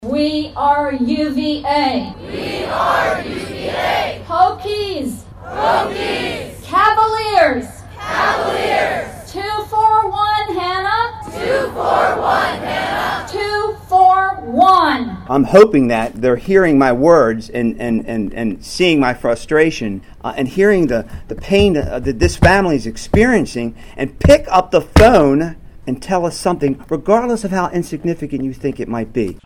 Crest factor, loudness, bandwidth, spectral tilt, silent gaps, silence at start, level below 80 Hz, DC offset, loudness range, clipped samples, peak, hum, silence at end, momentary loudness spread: 16 dB; -15 LUFS; 16 kHz; -5.5 dB/octave; none; 0 s; -32 dBFS; under 0.1%; 6 LU; 0.1%; 0 dBFS; none; 0.1 s; 13 LU